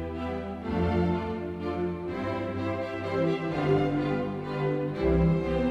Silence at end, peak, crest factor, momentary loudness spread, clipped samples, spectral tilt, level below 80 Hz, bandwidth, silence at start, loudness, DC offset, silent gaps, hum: 0 s; -14 dBFS; 14 dB; 8 LU; under 0.1%; -8.5 dB/octave; -42 dBFS; 7.8 kHz; 0 s; -29 LUFS; under 0.1%; none; none